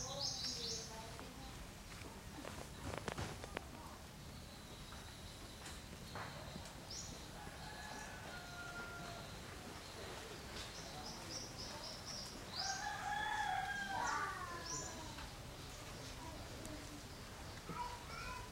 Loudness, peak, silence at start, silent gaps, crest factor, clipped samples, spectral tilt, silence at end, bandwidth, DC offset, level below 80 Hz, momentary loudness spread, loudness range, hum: -47 LUFS; -22 dBFS; 0 s; none; 26 dB; under 0.1%; -2.5 dB/octave; 0 s; 16 kHz; under 0.1%; -60 dBFS; 11 LU; 8 LU; none